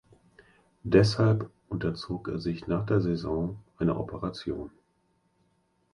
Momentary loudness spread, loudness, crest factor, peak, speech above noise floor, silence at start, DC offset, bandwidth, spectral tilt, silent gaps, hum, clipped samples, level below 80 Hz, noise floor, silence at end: 13 LU; -29 LUFS; 24 dB; -6 dBFS; 44 dB; 0.85 s; under 0.1%; 11 kHz; -7.5 dB/octave; none; none; under 0.1%; -50 dBFS; -71 dBFS; 1.25 s